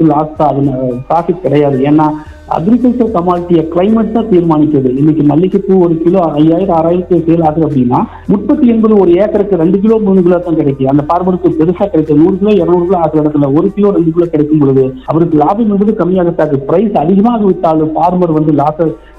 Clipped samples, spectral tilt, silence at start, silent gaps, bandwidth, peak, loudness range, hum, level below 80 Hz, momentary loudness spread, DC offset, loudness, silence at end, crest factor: 1%; -10.5 dB/octave; 0 s; none; 5 kHz; 0 dBFS; 1 LU; none; -36 dBFS; 4 LU; under 0.1%; -10 LUFS; 0.2 s; 8 dB